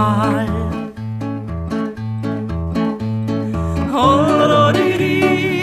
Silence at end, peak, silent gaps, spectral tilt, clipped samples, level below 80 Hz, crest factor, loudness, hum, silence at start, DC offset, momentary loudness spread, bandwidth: 0 s; -2 dBFS; none; -7 dB/octave; under 0.1%; -34 dBFS; 16 dB; -17 LUFS; none; 0 s; under 0.1%; 12 LU; 14.5 kHz